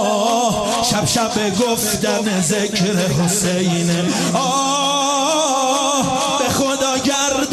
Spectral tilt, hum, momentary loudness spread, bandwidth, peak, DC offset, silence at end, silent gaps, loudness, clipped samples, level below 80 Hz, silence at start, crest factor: -3.5 dB/octave; none; 2 LU; 13 kHz; -4 dBFS; under 0.1%; 0 s; none; -16 LUFS; under 0.1%; -48 dBFS; 0 s; 12 dB